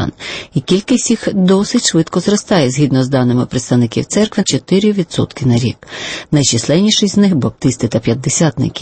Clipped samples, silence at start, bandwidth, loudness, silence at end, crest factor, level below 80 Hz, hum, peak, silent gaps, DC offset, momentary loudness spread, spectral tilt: under 0.1%; 0 s; 8.8 kHz; -13 LUFS; 0 s; 12 dB; -44 dBFS; none; 0 dBFS; none; under 0.1%; 6 LU; -5 dB/octave